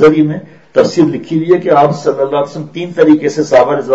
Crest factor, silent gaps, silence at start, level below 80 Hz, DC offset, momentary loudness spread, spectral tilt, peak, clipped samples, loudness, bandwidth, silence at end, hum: 10 dB; none; 0 s; -50 dBFS; 0.3%; 9 LU; -7 dB/octave; 0 dBFS; 0.4%; -11 LUFS; 8 kHz; 0 s; none